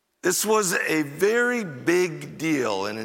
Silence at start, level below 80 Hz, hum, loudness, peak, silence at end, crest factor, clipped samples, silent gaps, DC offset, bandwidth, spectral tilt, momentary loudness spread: 0.25 s; -72 dBFS; none; -23 LUFS; -8 dBFS; 0 s; 16 dB; under 0.1%; none; under 0.1%; 17 kHz; -3.5 dB/octave; 5 LU